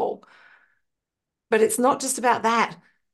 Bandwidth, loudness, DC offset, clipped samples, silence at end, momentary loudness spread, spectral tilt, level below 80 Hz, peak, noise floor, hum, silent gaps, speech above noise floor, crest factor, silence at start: 12.5 kHz; -22 LUFS; under 0.1%; under 0.1%; 0.4 s; 8 LU; -2.5 dB/octave; -74 dBFS; -6 dBFS; -85 dBFS; none; none; 64 dB; 18 dB; 0 s